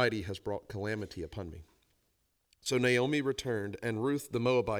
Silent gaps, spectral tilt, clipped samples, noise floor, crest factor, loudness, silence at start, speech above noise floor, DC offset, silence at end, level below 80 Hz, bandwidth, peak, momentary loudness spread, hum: none; -5 dB/octave; under 0.1%; -77 dBFS; 18 dB; -33 LUFS; 0 s; 44 dB; under 0.1%; 0 s; -58 dBFS; over 20 kHz; -16 dBFS; 14 LU; none